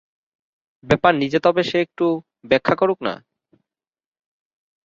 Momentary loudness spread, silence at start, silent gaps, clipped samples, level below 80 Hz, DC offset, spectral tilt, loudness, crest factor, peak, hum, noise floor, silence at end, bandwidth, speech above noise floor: 10 LU; 0.85 s; none; under 0.1%; -54 dBFS; under 0.1%; -6.5 dB/octave; -19 LUFS; 20 dB; -2 dBFS; none; -78 dBFS; 1.7 s; 7.6 kHz; 60 dB